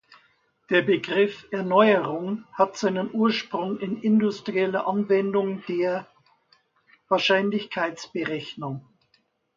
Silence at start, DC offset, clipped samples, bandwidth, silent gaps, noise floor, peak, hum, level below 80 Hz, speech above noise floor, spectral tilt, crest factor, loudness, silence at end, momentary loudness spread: 0.7 s; under 0.1%; under 0.1%; 7.4 kHz; none; -68 dBFS; -4 dBFS; none; -72 dBFS; 44 dB; -6 dB/octave; 20 dB; -24 LUFS; 0.75 s; 10 LU